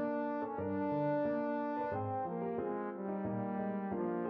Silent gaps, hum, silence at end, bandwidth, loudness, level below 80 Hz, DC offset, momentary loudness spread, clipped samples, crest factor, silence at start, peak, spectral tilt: none; none; 0 s; 5.6 kHz; -37 LUFS; -72 dBFS; under 0.1%; 4 LU; under 0.1%; 12 dB; 0 s; -24 dBFS; -8 dB/octave